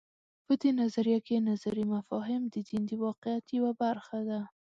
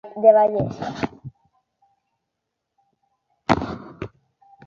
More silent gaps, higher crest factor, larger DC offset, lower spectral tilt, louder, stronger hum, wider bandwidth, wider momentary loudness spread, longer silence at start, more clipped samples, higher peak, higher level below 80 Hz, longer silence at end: first, 3.18-3.22 s vs none; second, 14 dB vs 22 dB; neither; about the same, -7.5 dB/octave vs -7 dB/octave; second, -32 LUFS vs -21 LUFS; neither; about the same, 7.6 kHz vs 7.4 kHz; second, 7 LU vs 23 LU; first, 0.5 s vs 0.05 s; neither; second, -16 dBFS vs -2 dBFS; second, -74 dBFS vs -50 dBFS; second, 0.2 s vs 0.6 s